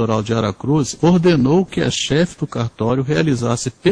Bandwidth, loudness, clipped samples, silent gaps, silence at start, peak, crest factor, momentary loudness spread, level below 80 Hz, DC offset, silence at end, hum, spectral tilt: 10.5 kHz; -17 LUFS; under 0.1%; none; 0 s; -2 dBFS; 14 dB; 7 LU; -44 dBFS; under 0.1%; 0 s; none; -6 dB/octave